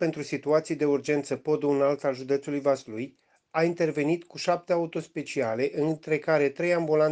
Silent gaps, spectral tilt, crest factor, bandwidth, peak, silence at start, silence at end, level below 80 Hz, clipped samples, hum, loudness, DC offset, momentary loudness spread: none; -6 dB/octave; 16 dB; 9.4 kHz; -10 dBFS; 0 s; 0 s; -74 dBFS; under 0.1%; none; -27 LUFS; under 0.1%; 8 LU